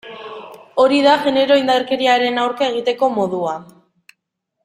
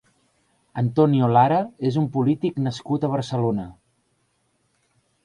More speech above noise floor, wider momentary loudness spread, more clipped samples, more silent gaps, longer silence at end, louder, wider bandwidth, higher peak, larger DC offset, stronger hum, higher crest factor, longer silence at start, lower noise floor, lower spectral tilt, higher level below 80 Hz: first, 59 dB vs 48 dB; first, 18 LU vs 10 LU; neither; neither; second, 1 s vs 1.55 s; first, -16 LUFS vs -22 LUFS; first, 12.5 kHz vs 10.5 kHz; about the same, -2 dBFS vs -4 dBFS; neither; neither; about the same, 16 dB vs 18 dB; second, 0.05 s vs 0.75 s; first, -75 dBFS vs -68 dBFS; second, -4.5 dB/octave vs -8.5 dB/octave; second, -64 dBFS vs -58 dBFS